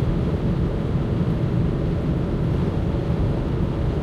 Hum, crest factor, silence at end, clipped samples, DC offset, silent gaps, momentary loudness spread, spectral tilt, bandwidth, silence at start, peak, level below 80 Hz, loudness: none; 12 dB; 0 s; under 0.1%; under 0.1%; none; 1 LU; -9.5 dB/octave; 8.2 kHz; 0 s; -10 dBFS; -28 dBFS; -23 LUFS